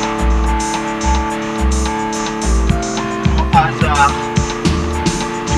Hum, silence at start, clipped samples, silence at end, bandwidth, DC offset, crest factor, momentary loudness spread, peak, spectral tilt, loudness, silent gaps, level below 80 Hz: none; 0 s; under 0.1%; 0 s; 12.5 kHz; under 0.1%; 14 dB; 6 LU; 0 dBFS; -5 dB/octave; -16 LUFS; none; -20 dBFS